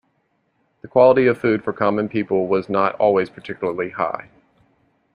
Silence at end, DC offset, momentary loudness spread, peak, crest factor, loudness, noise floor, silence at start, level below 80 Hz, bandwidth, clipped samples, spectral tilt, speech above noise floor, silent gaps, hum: 0.9 s; under 0.1%; 11 LU; -2 dBFS; 18 dB; -19 LUFS; -67 dBFS; 0.85 s; -60 dBFS; 5.6 kHz; under 0.1%; -8.5 dB/octave; 49 dB; none; none